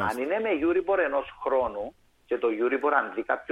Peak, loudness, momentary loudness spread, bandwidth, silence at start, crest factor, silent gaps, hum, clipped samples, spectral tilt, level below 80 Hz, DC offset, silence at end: -8 dBFS; -27 LUFS; 7 LU; 15.5 kHz; 0 s; 18 dB; none; none; under 0.1%; -6 dB/octave; -58 dBFS; under 0.1%; 0 s